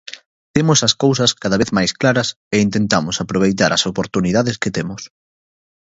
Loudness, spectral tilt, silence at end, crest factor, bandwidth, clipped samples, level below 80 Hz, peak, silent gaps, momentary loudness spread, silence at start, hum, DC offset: -16 LUFS; -4 dB/octave; 0.8 s; 18 dB; 8 kHz; under 0.1%; -46 dBFS; 0 dBFS; 0.26-0.54 s, 2.36-2.51 s; 8 LU; 0.1 s; none; under 0.1%